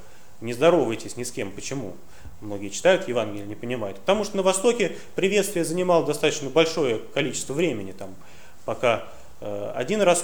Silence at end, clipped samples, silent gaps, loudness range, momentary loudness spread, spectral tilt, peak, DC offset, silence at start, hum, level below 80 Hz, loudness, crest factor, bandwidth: 0 s; under 0.1%; none; 4 LU; 15 LU; -4 dB/octave; -4 dBFS; 1%; 0.4 s; none; -56 dBFS; -24 LUFS; 20 dB; over 20 kHz